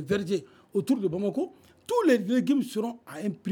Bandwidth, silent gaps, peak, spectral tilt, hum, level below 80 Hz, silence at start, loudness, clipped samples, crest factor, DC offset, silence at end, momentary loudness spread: 18.5 kHz; none; -10 dBFS; -6.5 dB/octave; none; -66 dBFS; 0 s; -28 LUFS; under 0.1%; 18 dB; under 0.1%; 0 s; 11 LU